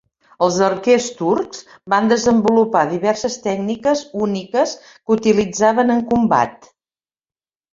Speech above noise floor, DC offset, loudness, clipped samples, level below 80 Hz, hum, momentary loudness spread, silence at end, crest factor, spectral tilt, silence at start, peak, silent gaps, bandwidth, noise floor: over 73 dB; under 0.1%; -17 LUFS; under 0.1%; -54 dBFS; none; 7 LU; 1.15 s; 16 dB; -5 dB/octave; 0.4 s; 0 dBFS; none; 7.8 kHz; under -90 dBFS